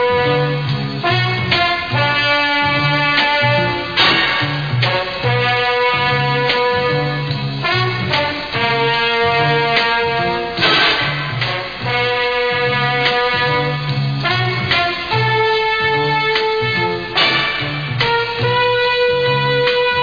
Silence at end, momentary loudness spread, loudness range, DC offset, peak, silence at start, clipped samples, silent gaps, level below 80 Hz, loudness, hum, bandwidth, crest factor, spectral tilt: 0 s; 5 LU; 2 LU; 0.4%; 0 dBFS; 0 s; under 0.1%; none; -44 dBFS; -15 LUFS; none; 5.2 kHz; 16 dB; -6 dB/octave